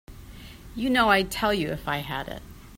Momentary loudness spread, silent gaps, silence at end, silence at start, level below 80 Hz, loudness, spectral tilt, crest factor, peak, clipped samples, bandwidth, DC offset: 24 LU; none; 0 s; 0.1 s; -46 dBFS; -25 LUFS; -4.5 dB/octave; 20 dB; -6 dBFS; under 0.1%; 16 kHz; under 0.1%